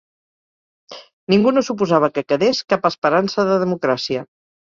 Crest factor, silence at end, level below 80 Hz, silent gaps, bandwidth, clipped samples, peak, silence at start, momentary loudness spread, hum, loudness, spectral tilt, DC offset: 18 dB; 0.45 s; -60 dBFS; 1.13-1.27 s, 2.98-3.02 s; 7.4 kHz; under 0.1%; 0 dBFS; 0.9 s; 10 LU; none; -18 LUFS; -5.5 dB/octave; under 0.1%